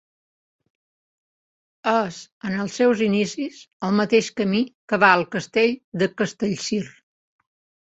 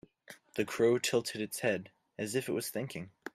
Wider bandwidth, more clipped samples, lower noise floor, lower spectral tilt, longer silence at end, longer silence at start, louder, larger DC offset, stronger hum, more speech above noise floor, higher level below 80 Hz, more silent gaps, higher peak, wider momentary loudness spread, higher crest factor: second, 8.2 kHz vs 16 kHz; neither; first, under -90 dBFS vs -57 dBFS; about the same, -5 dB/octave vs -4 dB/octave; first, 0.95 s vs 0.05 s; first, 1.85 s vs 0.3 s; first, -22 LUFS vs -34 LUFS; neither; neither; first, over 68 dB vs 24 dB; first, -64 dBFS vs -74 dBFS; first, 2.32-2.41 s, 3.73-3.80 s, 4.75-4.88 s, 5.84-5.92 s vs none; first, -2 dBFS vs -16 dBFS; about the same, 12 LU vs 14 LU; about the same, 22 dB vs 18 dB